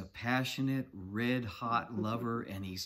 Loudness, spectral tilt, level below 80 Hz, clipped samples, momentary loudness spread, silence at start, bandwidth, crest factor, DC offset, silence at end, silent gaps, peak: -35 LUFS; -5.5 dB/octave; -66 dBFS; under 0.1%; 6 LU; 0 s; 16 kHz; 18 dB; under 0.1%; 0 s; none; -18 dBFS